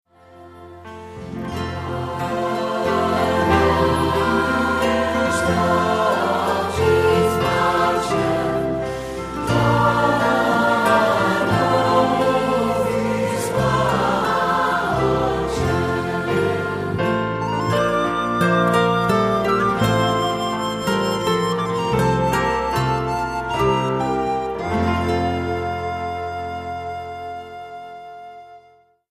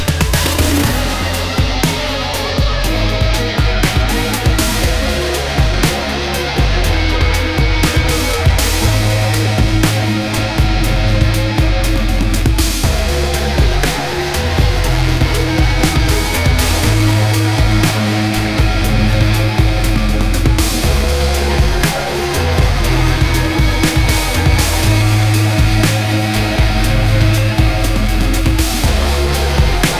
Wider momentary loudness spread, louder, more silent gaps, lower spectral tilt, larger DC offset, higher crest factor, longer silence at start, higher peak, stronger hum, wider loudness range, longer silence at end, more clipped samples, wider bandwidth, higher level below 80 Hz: first, 11 LU vs 3 LU; second, -19 LUFS vs -14 LUFS; neither; about the same, -5.5 dB/octave vs -4.5 dB/octave; neither; first, 18 dB vs 12 dB; first, 0.35 s vs 0 s; about the same, -2 dBFS vs 0 dBFS; neither; first, 5 LU vs 2 LU; first, 0.5 s vs 0 s; neither; about the same, 15.5 kHz vs 16 kHz; second, -40 dBFS vs -16 dBFS